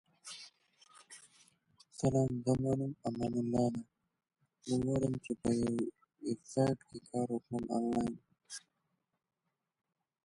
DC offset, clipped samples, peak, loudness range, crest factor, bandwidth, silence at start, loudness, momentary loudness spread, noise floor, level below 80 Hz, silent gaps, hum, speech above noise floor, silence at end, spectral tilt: under 0.1%; under 0.1%; -18 dBFS; 3 LU; 18 dB; 11.5 kHz; 0.25 s; -36 LUFS; 18 LU; -83 dBFS; -62 dBFS; none; none; 49 dB; 1.65 s; -7 dB/octave